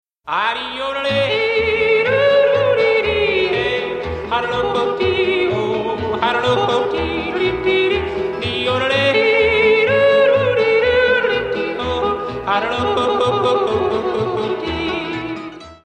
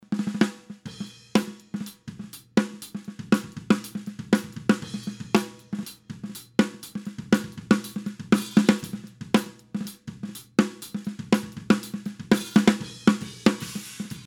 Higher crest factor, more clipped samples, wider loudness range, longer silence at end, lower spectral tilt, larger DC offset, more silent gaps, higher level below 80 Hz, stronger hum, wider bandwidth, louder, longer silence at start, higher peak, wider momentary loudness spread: second, 14 dB vs 24 dB; neither; about the same, 4 LU vs 4 LU; about the same, 0.1 s vs 0 s; about the same, -5.5 dB/octave vs -5.5 dB/octave; neither; neither; first, -42 dBFS vs -60 dBFS; neither; second, 9.2 kHz vs 17.5 kHz; first, -17 LUFS vs -26 LUFS; first, 0.25 s vs 0.1 s; about the same, -2 dBFS vs -4 dBFS; second, 8 LU vs 16 LU